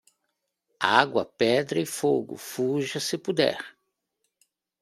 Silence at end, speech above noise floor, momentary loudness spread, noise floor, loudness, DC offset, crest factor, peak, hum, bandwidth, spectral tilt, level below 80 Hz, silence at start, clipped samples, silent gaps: 1.1 s; 54 dB; 8 LU; -80 dBFS; -25 LUFS; under 0.1%; 24 dB; -2 dBFS; none; 16 kHz; -4 dB/octave; -72 dBFS; 0.8 s; under 0.1%; none